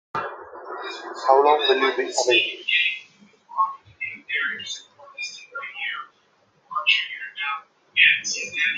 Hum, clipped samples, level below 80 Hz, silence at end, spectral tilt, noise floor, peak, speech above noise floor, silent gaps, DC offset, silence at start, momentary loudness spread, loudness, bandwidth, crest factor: none; under 0.1%; -76 dBFS; 0 s; -0.5 dB/octave; -62 dBFS; -2 dBFS; 42 dB; none; under 0.1%; 0.15 s; 18 LU; -21 LUFS; 9.6 kHz; 22 dB